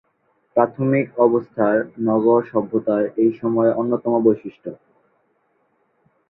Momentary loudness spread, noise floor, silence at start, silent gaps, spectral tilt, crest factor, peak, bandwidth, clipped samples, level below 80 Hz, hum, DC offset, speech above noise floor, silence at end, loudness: 6 LU; -65 dBFS; 0.55 s; none; -12.5 dB/octave; 18 dB; -2 dBFS; 3.9 kHz; under 0.1%; -64 dBFS; none; under 0.1%; 47 dB; 1.55 s; -19 LUFS